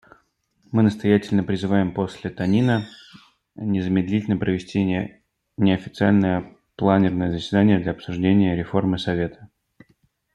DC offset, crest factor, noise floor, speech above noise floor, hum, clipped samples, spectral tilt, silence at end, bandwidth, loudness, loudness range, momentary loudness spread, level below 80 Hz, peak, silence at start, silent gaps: under 0.1%; 18 dB; -64 dBFS; 44 dB; none; under 0.1%; -8 dB/octave; 0.9 s; 8.6 kHz; -22 LUFS; 3 LU; 9 LU; -54 dBFS; -2 dBFS; 0.7 s; none